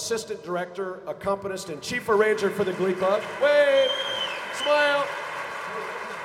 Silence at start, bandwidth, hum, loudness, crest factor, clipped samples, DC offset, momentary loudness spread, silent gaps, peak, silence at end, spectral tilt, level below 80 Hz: 0 s; 15.5 kHz; none; -25 LUFS; 16 dB; under 0.1%; under 0.1%; 12 LU; none; -10 dBFS; 0 s; -3.5 dB/octave; -64 dBFS